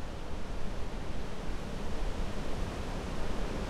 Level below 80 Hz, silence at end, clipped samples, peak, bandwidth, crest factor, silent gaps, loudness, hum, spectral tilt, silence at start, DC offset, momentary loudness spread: -38 dBFS; 0 s; under 0.1%; -20 dBFS; 12 kHz; 12 dB; none; -40 LUFS; none; -5.5 dB/octave; 0 s; under 0.1%; 3 LU